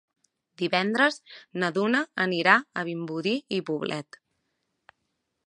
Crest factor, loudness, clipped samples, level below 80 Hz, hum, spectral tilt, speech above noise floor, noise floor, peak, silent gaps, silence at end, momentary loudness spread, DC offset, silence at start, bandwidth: 24 dB; -26 LUFS; under 0.1%; -78 dBFS; none; -5 dB/octave; 53 dB; -79 dBFS; -4 dBFS; none; 1.45 s; 12 LU; under 0.1%; 0.6 s; 11.5 kHz